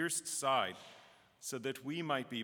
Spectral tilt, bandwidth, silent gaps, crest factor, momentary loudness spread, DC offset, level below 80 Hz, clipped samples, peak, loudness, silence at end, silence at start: -2.5 dB/octave; over 20 kHz; none; 20 dB; 15 LU; under 0.1%; -88 dBFS; under 0.1%; -18 dBFS; -37 LUFS; 0 s; 0 s